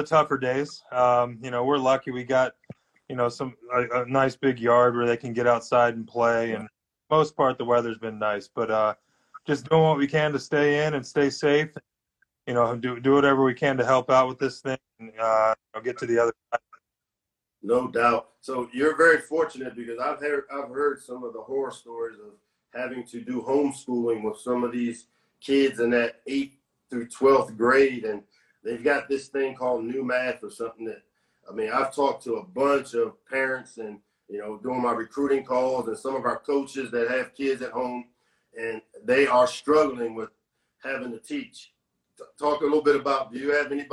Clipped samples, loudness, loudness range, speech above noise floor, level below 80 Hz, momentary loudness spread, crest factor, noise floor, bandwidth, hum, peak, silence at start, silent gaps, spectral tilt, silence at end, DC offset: under 0.1%; -25 LUFS; 6 LU; 62 dB; -64 dBFS; 15 LU; 18 dB; -86 dBFS; 12 kHz; none; -6 dBFS; 0 s; none; -5.5 dB/octave; 0.05 s; under 0.1%